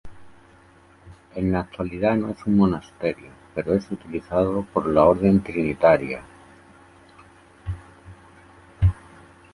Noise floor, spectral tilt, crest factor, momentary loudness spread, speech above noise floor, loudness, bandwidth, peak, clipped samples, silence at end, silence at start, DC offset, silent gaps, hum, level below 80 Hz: -52 dBFS; -9 dB/octave; 20 dB; 17 LU; 31 dB; -22 LUFS; 11.5 kHz; -4 dBFS; under 0.1%; 0.6 s; 0.05 s; under 0.1%; none; none; -40 dBFS